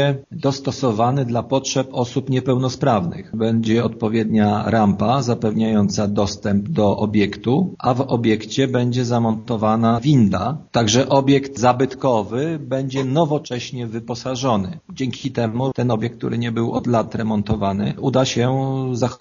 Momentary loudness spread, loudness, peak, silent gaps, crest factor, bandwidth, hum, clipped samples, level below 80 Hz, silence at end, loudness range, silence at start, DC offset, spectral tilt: 7 LU; -19 LUFS; 0 dBFS; none; 18 dB; 7.4 kHz; none; under 0.1%; -50 dBFS; 0.05 s; 5 LU; 0 s; under 0.1%; -6 dB/octave